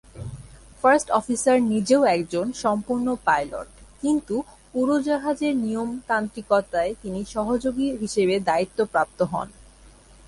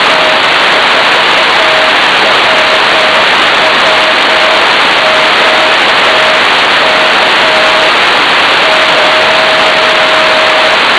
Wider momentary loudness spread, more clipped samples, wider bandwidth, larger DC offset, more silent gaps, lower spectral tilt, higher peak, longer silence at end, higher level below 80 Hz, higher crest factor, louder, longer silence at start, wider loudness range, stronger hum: first, 12 LU vs 0 LU; neither; about the same, 11.5 kHz vs 11 kHz; neither; neither; first, -5 dB/octave vs -1.5 dB/octave; second, -6 dBFS vs 0 dBFS; first, 0.65 s vs 0 s; second, -50 dBFS vs -44 dBFS; first, 18 dB vs 6 dB; second, -23 LUFS vs -5 LUFS; first, 0.15 s vs 0 s; first, 3 LU vs 0 LU; neither